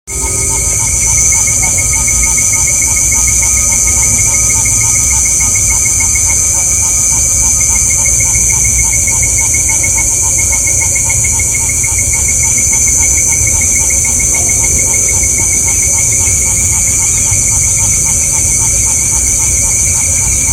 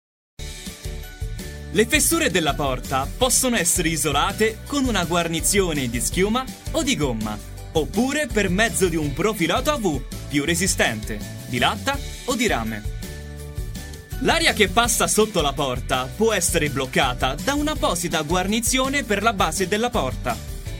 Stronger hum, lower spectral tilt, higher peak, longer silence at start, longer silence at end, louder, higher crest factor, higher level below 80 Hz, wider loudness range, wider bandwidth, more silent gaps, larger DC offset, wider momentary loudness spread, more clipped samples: neither; second, -1.5 dB/octave vs -3.5 dB/octave; about the same, 0 dBFS vs -2 dBFS; second, 0.05 s vs 0.4 s; about the same, 0 s vs 0 s; first, -7 LUFS vs -21 LUFS; second, 10 dB vs 20 dB; first, -22 dBFS vs -34 dBFS; about the same, 1 LU vs 3 LU; first, over 20 kHz vs 16.5 kHz; neither; neither; second, 2 LU vs 15 LU; first, 0.2% vs under 0.1%